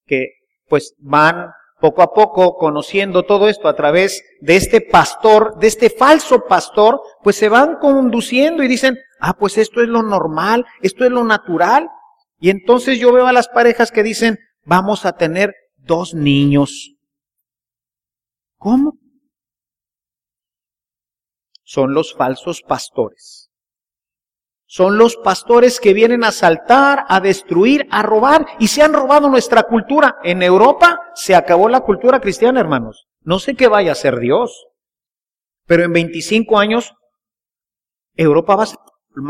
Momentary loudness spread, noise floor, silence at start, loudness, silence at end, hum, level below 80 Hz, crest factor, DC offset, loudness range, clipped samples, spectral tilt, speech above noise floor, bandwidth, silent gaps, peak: 9 LU; under -90 dBFS; 0.1 s; -13 LUFS; 0 s; none; -46 dBFS; 14 dB; under 0.1%; 10 LU; under 0.1%; -5 dB/octave; over 78 dB; 15.5 kHz; none; 0 dBFS